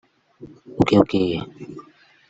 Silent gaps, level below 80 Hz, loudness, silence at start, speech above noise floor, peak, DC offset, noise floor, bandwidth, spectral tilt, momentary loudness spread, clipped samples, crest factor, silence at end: none; -50 dBFS; -19 LUFS; 0.4 s; 28 dB; -2 dBFS; under 0.1%; -49 dBFS; 8 kHz; -7.5 dB/octave; 22 LU; under 0.1%; 20 dB; 0.5 s